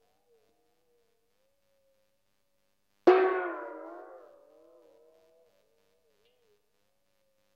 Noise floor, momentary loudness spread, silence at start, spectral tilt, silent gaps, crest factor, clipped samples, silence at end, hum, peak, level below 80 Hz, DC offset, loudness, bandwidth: -79 dBFS; 25 LU; 3.05 s; -5.5 dB/octave; none; 28 dB; under 0.1%; 3.4 s; none; -6 dBFS; -86 dBFS; under 0.1%; -27 LUFS; 6.2 kHz